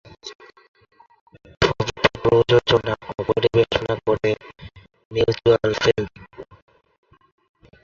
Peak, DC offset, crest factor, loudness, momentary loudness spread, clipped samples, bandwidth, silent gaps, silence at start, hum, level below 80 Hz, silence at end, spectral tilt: -2 dBFS; under 0.1%; 20 dB; -20 LUFS; 22 LU; under 0.1%; 7.4 kHz; 0.35-0.39 s, 0.68-0.74 s, 1.21-1.26 s, 5.05-5.11 s; 0.25 s; none; -44 dBFS; 1.4 s; -5.5 dB/octave